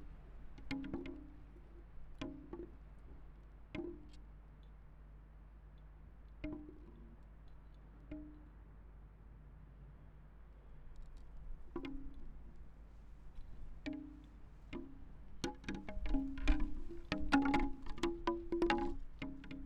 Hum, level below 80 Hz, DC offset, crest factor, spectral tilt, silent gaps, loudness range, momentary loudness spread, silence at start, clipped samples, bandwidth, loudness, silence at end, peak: none; -48 dBFS; under 0.1%; 26 dB; -6 dB/octave; none; 19 LU; 22 LU; 0 s; under 0.1%; 9.2 kHz; -43 LUFS; 0 s; -18 dBFS